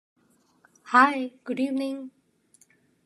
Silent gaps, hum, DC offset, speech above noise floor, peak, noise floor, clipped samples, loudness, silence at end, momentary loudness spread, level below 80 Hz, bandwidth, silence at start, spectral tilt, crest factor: none; none; under 0.1%; 39 dB; -4 dBFS; -63 dBFS; under 0.1%; -24 LUFS; 0.95 s; 17 LU; -90 dBFS; 12 kHz; 0.85 s; -4 dB/octave; 24 dB